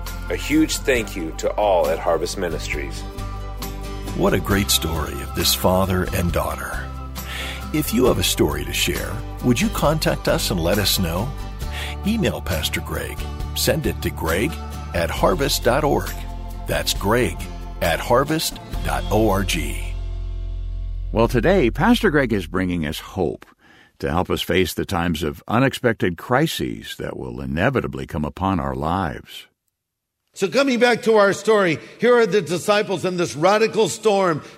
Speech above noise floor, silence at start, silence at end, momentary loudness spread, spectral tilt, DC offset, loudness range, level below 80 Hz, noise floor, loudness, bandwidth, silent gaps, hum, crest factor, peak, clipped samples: 60 dB; 0 s; 0 s; 13 LU; -4.5 dB/octave; under 0.1%; 5 LU; -32 dBFS; -79 dBFS; -21 LUFS; 16 kHz; none; none; 18 dB; -2 dBFS; under 0.1%